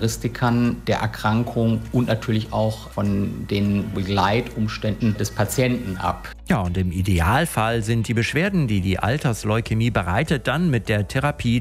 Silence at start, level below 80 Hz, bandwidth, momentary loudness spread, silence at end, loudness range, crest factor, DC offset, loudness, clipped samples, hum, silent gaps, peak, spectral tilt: 0 s; -38 dBFS; 16 kHz; 5 LU; 0 s; 2 LU; 16 dB; under 0.1%; -22 LUFS; under 0.1%; none; none; -6 dBFS; -6 dB/octave